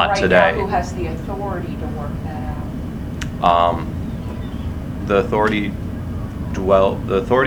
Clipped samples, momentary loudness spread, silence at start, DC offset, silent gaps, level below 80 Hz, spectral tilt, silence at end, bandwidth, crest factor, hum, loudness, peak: under 0.1%; 13 LU; 0 s; under 0.1%; none; -32 dBFS; -6.5 dB/octave; 0 s; over 20 kHz; 20 dB; none; -20 LUFS; 0 dBFS